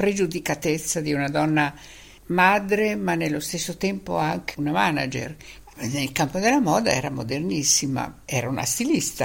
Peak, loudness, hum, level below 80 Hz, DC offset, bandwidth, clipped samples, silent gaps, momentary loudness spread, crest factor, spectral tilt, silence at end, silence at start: -4 dBFS; -23 LUFS; none; -52 dBFS; under 0.1%; 17 kHz; under 0.1%; none; 9 LU; 20 dB; -4 dB/octave; 0 s; 0 s